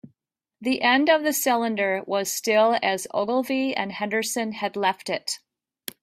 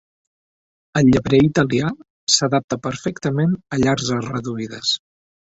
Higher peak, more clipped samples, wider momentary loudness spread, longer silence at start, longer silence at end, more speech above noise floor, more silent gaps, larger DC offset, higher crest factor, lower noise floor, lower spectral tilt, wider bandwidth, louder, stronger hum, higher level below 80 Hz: second, -6 dBFS vs 0 dBFS; neither; about the same, 9 LU vs 11 LU; second, 0.05 s vs 0.95 s; about the same, 0.65 s vs 0.6 s; second, 55 dB vs over 72 dB; second, none vs 2.10-2.27 s, 2.64-2.68 s; neither; about the same, 18 dB vs 20 dB; second, -78 dBFS vs under -90 dBFS; second, -2.5 dB/octave vs -4.5 dB/octave; first, 16 kHz vs 8.2 kHz; second, -23 LUFS vs -19 LUFS; neither; second, -72 dBFS vs -46 dBFS